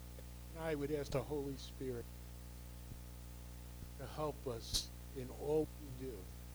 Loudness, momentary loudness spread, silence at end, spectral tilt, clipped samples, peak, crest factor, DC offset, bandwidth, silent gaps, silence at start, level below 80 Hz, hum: -44 LUFS; 14 LU; 0 s; -5 dB/octave; under 0.1%; -22 dBFS; 22 dB; under 0.1%; over 20 kHz; none; 0 s; -52 dBFS; 60 Hz at -50 dBFS